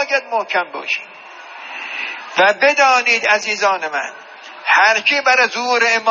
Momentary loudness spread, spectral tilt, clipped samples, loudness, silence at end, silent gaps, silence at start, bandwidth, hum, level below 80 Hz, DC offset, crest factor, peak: 19 LU; 2.5 dB/octave; under 0.1%; -15 LUFS; 0 s; none; 0 s; 7.4 kHz; none; -84 dBFS; under 0.1%; 16 dB; 0 dBFS